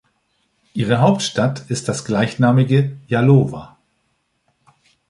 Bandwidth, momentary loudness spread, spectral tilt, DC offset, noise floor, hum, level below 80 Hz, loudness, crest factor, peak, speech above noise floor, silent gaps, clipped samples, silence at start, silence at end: 11.5 kHz; 10 LU; -6.5 dB/octave; under 0.1%; -67 dBFS; none; -54 dBFS; -17 LUFS; 16 dB; -2 dBFS; 51 dB; none; under 0.1%; 0.75 s; 1.45 s